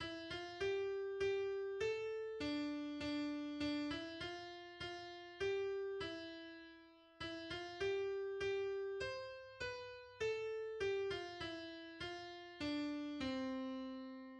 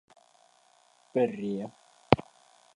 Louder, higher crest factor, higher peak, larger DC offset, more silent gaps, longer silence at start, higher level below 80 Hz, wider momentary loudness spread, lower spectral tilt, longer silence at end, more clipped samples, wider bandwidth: second, -44 LUFS vs -30 LUFS; second, 14 dB vs 32 dB; second, -30 dBFS vs 0 dBFS; neither; neither; second, 0 s vs 1.15 s; second, -70 dBFS vs -58 dBFS; about the same, 10 LU vs 10 LU; second, -5 dB/octave vs -7.5 dB/octave; second, 0 s vs 0.55 s; neither; second, 9.4 kHz vs 11 kHz